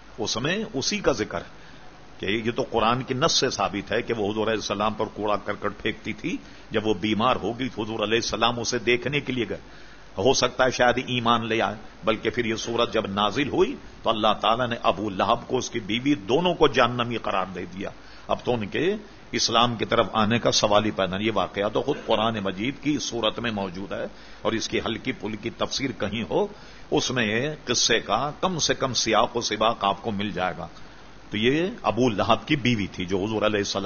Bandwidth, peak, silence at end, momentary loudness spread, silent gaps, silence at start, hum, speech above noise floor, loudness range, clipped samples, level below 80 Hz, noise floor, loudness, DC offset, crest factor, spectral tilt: 7 kHz; -4 dBFS; 0 s; 10 LU; none; 0 s; none; 22 dB; 4 LU; under 0.1%; -48 dBFS; -47 dBFS; -24 LUFS; 0.5%; 20 dB; -4 dB/octave